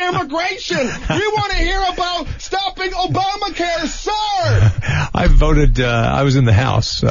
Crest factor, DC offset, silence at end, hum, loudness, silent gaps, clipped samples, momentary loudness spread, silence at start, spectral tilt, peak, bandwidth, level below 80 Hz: 14 dB; under 0.1%; 0 s; none; -17 LUFS; none; under 0.1%; 6 LU; 0 s; -5.5 dB/octave; 0 dBFS; 7.4 kHz; -20 dBFS